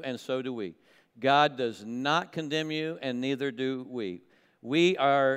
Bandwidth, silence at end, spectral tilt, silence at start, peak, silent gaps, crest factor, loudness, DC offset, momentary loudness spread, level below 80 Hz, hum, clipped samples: 13 kHz; 0 s; -5 dB/octave; 0 s; -10 dBFS; none; 20 dB; -29 LUFS; under 0.1%; 14 LU; -80 dBFS; none; under 0.1%